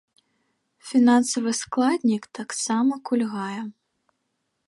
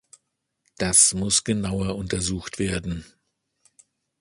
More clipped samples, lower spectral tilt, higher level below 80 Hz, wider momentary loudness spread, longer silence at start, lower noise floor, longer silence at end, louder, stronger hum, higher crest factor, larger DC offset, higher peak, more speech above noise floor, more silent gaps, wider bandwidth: neither; about the same, -4 dB/octave vs -3 dB/octave; second, -72 dBFS vs -44 dBFS; about the same, 14 LU vs 14 LU; about the same, 0.85 s vs 0.8 s; about the same, -76 dBFS vs -76 dBFS; second, 0.95 s vs 1.15 s; about the same, -23 LUFS vs -21 LUFS; neither; second, 16 dB vs 24 dB; neither; second, -8 dBFS vs -2 dBFS; about the same, 54 dB vs 52 dB; neither; about the same, 11.5 kHz vs 11.5 kHz